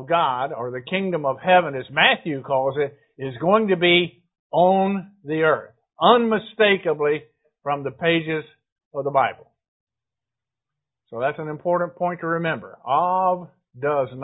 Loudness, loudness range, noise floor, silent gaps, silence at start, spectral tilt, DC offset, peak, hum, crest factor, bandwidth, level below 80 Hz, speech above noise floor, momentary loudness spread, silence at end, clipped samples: -21 LUFS; 8 LU; -88 dBFS; 4.39-4.50 s, 8.72-8.76 s, 8.85-8.91 s, 9.68-9.87 s; 0 s; -10 dB/octave; under 0.1%; 0 dBFS; none; 22 dB; 4 kHz; -64 dBFS; 67 dB; 12 LU; 0 s; under 0.1%